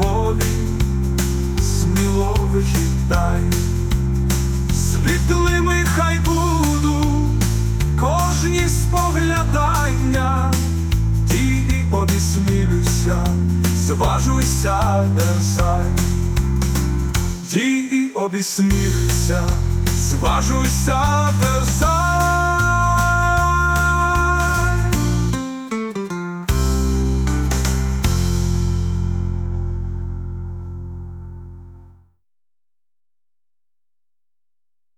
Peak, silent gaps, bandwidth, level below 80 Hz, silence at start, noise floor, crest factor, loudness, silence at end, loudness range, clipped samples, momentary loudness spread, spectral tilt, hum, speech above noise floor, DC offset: -4 dBFS; none; 19 kHz; -24 dBFS; 0 s; under -90 dBFS; 12 dB; -18 LUFS; 3.15 s; 5 LU; under 0.1%; 7 LU; -5.5 dB/octave; none; over 73 dB; under 0.1%